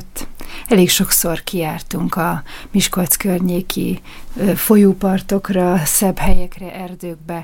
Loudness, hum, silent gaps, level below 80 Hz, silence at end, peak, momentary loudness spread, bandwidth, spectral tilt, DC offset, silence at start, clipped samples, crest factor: -16 LUFS; none; none; -28 dBFS; 0 s; 0 dBFS; 18 LU; 17 kHz; -4.5 dB/octave; under 0.1%; 0 s; under 0.1%; 16 dB